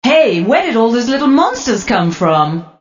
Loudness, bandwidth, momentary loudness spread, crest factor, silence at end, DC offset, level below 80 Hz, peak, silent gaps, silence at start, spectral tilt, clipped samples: -13 LUFS; 7.4 kHz; 4 LU; 12 dB; 0.1 s; under 0.1%; -46 dBFS; 0 dBFS; none; 0.05 s; -5 dB/octave; under 0.1%